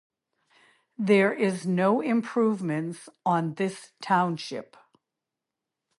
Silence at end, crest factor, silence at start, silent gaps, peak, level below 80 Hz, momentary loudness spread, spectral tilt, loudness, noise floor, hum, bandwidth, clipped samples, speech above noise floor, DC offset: 1.35 s; 18 dB; 1 s; none; -8 dBFS; -78 dBFS; 13 LU; -6.5 dB/octave; -26 LUFS; -87 dBFS; none; 11.5 kHz; under 0.1%; 61 dB; under 0.1%